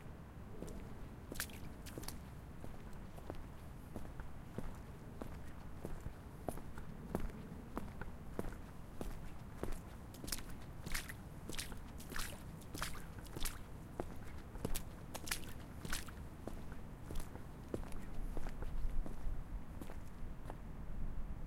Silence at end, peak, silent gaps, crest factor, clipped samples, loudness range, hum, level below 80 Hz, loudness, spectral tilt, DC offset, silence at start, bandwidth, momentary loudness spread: 0 s; -20 dBFS; none; 24 dB; under 0.1%; 5 LU; none; -48 dBFS; -49 LUFS; -4.5 dB/octave; under 0.1%; 0 s; 16.5 kHz; 8 LU